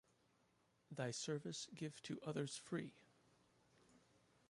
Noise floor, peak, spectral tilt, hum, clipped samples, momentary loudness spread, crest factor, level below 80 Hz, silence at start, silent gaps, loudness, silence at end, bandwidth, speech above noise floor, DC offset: -79 dBFS; -32 dBFS; -4.5 dB/octave; none; under 0.1%; 5 LU; 20 dB; -86 dBFS; 0.9 s; none; -48 LUFS; 0.5 s; 11.5 kHz; 32 dB; under 0.1%